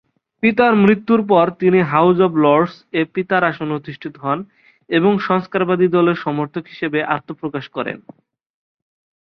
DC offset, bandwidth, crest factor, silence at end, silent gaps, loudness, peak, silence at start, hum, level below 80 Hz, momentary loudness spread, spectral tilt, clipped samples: under 0.1%; 5.8 kHz; 16 dB; 1.25 s; none; -17 LUFS; 0 dBFS; 0.45 s; none; -60 dBFS; 12 LU; -9 dB/octave; under 0.1%